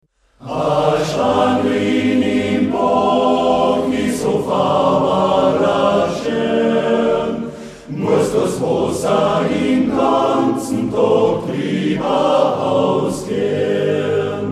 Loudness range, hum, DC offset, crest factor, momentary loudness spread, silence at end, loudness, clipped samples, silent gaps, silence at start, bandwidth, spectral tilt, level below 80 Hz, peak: 2 LU; none; under 0.1%; 14 dB; 5 LU; 0 s; -16 LUFS; under 0.1%; none; 0.4 s; 14 kHz; -6 dB/octave; -46 dBFS; -2 dBFS